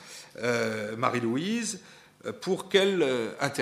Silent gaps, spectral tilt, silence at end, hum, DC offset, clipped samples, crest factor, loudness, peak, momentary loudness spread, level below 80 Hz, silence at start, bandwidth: none; -4 dB/octave; 0 s; none; under 0.1%; under 0.1%; 20 dB; -28 LUFS; -8 dBFS; 15 LU; -76 dBFS; 0 s; 15.5 kHz